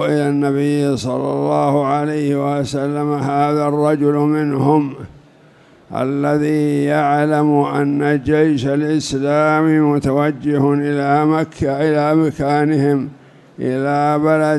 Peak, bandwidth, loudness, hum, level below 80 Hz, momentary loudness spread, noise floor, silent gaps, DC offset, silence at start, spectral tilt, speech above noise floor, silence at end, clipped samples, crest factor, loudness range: -2 dBFS; 12 kHz; -16 LUFS; none; -48 dBFS; 5 LU; -47 dBFS; none; under 0.1%; 0 s; -7.5 dB/octave; 32 dB; 0 s; under 0.1%; 14 dB; 2 LU